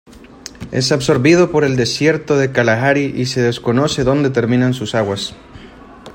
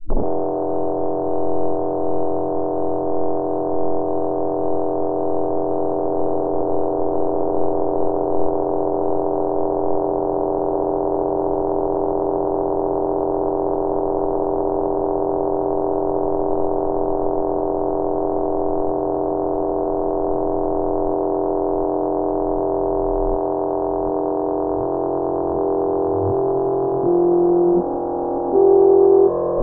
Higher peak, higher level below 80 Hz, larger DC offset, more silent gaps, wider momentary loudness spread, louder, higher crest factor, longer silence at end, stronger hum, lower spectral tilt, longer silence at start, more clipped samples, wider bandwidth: first, 0 dBFS vs -4 dBFS; second, -44 dBFS vs -36 dBFS; neither; neither; first, 11 LU vs 5 LU; first, -15 LUFS vs -20 LUFS; about the same, 14 dB vs 14 dB; about the same, 0 s vs 0 s; neither; second, -5.5 dB/octave vs -7.5 dB/octave; first, 0.15 s vs 0 s; neither; first, 16.5 kHz vs 1.9 kHz